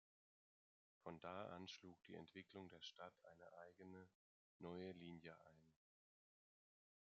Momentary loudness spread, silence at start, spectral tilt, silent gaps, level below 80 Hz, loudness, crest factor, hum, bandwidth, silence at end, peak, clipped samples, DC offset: 9 LU; 1.05 s; -4 dB/octave; 4.15-4.60 s; under -90 dBFS; -59 LUFS; 22 dB; none; 7.2 kHz; 1.3 s; -40 dBFS; under 0.1%; under 0.1%